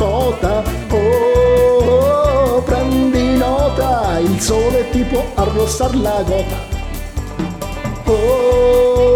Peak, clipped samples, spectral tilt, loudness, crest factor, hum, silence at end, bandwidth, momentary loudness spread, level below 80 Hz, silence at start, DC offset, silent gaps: -2 dBFS; under 0.1%; -6 dB/octave; -15 LUFS; 12 dB; none; 0 s; 20 kHz; 12 LU; -24 dBFS; 0 s; under 0.1%; none